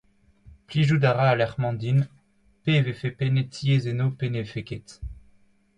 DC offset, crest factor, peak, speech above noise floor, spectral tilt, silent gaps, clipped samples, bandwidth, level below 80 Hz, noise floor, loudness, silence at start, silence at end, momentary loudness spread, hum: under 0.1%; 18 dB; -8 dBFS; 38 dB; -7.5 dB/octave; none; under 0.1%; 9.4 kHz; -50 dBFS; -61 dBFS; -24 LUFS; 0.45 s; 0.65 s; 16 LU; none